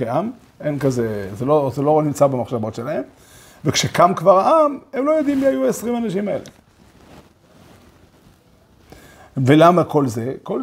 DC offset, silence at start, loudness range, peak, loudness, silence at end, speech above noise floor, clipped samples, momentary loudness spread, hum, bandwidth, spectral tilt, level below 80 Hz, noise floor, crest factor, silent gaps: under 0.1%; 0 s; 11 LU; 0 dBFS; -18 LUFS; 0 s; 35 dB; under 0.1%; 13 LU; none; 16 kHz; -6 dB/octave; -54 dBFS; -52 dBFS; 18 dB; none